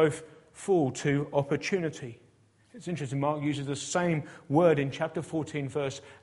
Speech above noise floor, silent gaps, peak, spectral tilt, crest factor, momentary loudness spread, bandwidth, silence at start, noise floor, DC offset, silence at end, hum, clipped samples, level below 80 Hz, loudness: 34 dB; none; -10 dBFS; -6 dB/octave; 20 dB; 12 LU; 11.5 kHz; 0 s; -63 dBFS; under 0.1%; 0.05 s; none; under 0.1%; -66 dBFS; -30 LUFS